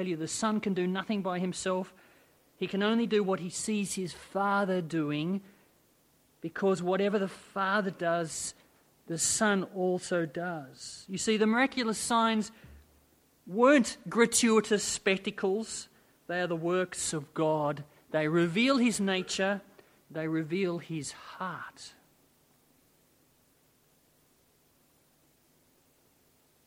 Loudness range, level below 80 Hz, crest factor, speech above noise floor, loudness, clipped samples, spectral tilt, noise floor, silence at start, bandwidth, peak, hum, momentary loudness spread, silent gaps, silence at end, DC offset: 8 LU; -70 dBFS; 22 dB; 37 dB; -30 LUFS; under 0.1%; -4 dB/octave; -67 dBFS; 0 s; 16 kHz; -10 dBFS; none; 13 LU; none; 4.75 s; under 0.1%